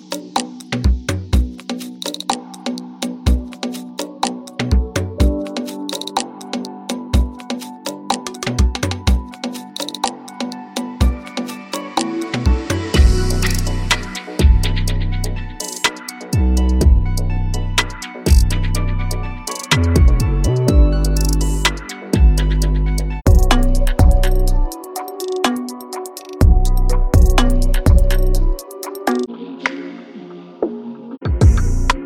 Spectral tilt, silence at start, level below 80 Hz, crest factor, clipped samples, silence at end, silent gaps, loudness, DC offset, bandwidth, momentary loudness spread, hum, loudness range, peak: -5 dB/octave; 0.1 s; -18 dBFS; 16 dB; under 0.1%; 0 s; none; -19 LUFS; under 0.1%; 16.5 kHz; 12 LU; none; 6 LU; 0 dBFS